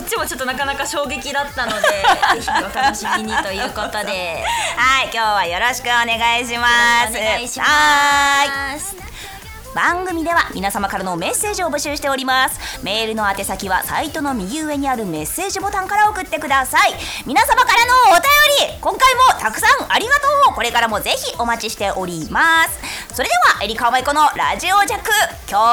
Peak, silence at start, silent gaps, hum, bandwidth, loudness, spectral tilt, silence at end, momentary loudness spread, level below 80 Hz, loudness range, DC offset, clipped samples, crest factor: -4 dBFS; 0 s; none; none; over 20 kHz; -16 LUFS; -1.5 dB/octave; 0 s; 10 LU; -40 dBFS; 7 LU; under 0.1%; under 0.1%; 12 dB